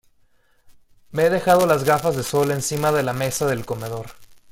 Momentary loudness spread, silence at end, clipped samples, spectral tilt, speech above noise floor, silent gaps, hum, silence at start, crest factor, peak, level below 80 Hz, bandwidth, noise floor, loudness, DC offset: 14 LU; 0.15 s; under 0.1%; -5 dB/octave; 38 dB; none; none; 0.7 s; 20 dB; -2 dBFS; -52 dBFS; 17 kHz; -58 dBFS; -20 LUFS; under 0.1%